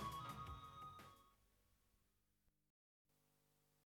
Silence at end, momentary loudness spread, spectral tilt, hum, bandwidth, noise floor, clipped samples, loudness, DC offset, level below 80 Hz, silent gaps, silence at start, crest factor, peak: 2.5 s; 11 LU; -4.5 dB/octave; 50 Hz at -85 dBFS; 19.5 kHz; -85 dBFS; under 0.1%; -55 LUFS; under 0.1%; -70 dBFS; none; 0 s; 20 dB; -38 dBFS